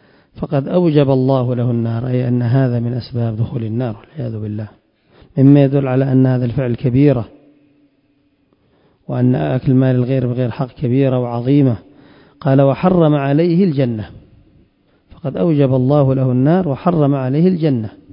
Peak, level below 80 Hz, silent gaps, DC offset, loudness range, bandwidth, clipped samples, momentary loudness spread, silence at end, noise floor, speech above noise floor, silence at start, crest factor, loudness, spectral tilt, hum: 0 dBFS; -46 dBFS; none; under 0.1%; 4 LU; 5.4 kHz; under 0.1%; 12 LU; 0.25 s; -59 dBFS; 45 dB; 0.35 s; 16 dB; -15 LUFS; -13 dB/octave; none